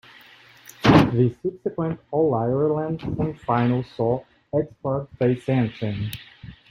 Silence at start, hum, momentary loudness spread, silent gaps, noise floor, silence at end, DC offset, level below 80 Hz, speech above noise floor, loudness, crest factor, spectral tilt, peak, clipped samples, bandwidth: 0.8 s; none; 12 LU; none; -50 dBFS; 0.2 s; under 0.1%; -48 dBFS; 26 dB; -23 LUFS; 20 dB; -8 dB/octave; -2 dBFS; under 0.1%; 16 kHz